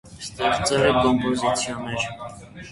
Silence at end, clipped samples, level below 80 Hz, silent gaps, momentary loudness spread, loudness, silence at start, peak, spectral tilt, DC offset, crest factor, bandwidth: 0 s; under 0.1%; -46 dBFS; none; 18 LU; -22 LUFS; 0.05 s; -6 dBFS; -4 dB/octave; under 0.1%; 16 dB; 11.5 kHz